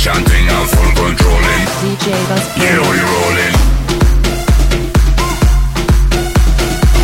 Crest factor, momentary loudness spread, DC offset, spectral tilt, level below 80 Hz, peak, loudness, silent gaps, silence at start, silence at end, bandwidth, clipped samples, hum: 10 dB; 3 LU; under 0.1%; -4.5 dB/octave; -12 dBFS; 0 dBFS; -12 LUFS; none; 0 s; 0 s; 16.5 kHz; under 0.1%; none